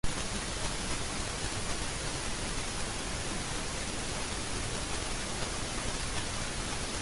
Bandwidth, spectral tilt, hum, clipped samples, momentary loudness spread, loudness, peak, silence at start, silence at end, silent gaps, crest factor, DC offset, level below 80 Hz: 11.5 kHz; -2.5 dB/octave; none; under 0.1%; 1 LU; -35 LUFS; -18 dBFS; 0.05 s; 0 s; none; 18 dB; under 0.1%; -42 dBFS